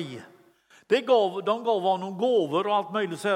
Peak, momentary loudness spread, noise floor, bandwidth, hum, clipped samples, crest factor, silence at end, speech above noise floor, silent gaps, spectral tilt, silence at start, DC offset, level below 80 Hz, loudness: -10 dBFS; 7 LU; -58 dBFS; 15.5 kHz; none; under 0.1%; 16 dB; 0 s; 33 dB; none; -5.5 dB/octave; 0 s; under 0.1%; -84 dBFS; -25 LUFS